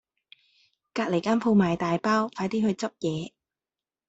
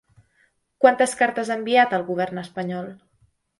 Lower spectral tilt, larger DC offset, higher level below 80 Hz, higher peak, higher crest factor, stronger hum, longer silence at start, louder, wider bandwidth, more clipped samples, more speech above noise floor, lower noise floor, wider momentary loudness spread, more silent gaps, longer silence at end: first, -6.5 dB/octave vs -4.5 dB/octave; neither; first, -62 dBFS vs -68 dBFS; second, -12 dBFS vs -2 dBFS; second, 16 dB vs 22 dB; neither; first, 0.95 s vs 0.8 s; second, -26 LUFS vs -21 LUFS; second, 8 kHz vs 11.5 kHz; neither; first, over 65 dB vs 44 dB; first, under -90 dBFS vs -65 dBFS; about the same, 10 LU vs 12 LU; neither; first, 0.8 s vs 0.65 s